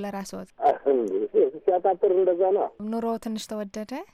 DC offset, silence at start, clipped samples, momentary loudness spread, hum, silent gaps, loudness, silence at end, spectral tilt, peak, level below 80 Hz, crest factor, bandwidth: under 0.1%; 0 s; under 0.1%; 12 LU; none; none; -25 LUFS; 0.1 s; -6 dB/octave; -10 dBFS; -64 dBFS; 14 dB; 14 kHz